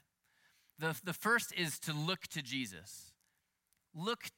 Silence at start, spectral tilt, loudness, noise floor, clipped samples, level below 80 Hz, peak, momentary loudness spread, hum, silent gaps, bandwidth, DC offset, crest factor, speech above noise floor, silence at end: 0.8 s; -3.5 dB/octave; -37 LUFS; -81 dBFS; under 0.1%; -82 dBFS; -20 dBFS; 18 LU; none; none; 17 kHz; under 0.1%; 22 dB; 43 dB; 0.05 s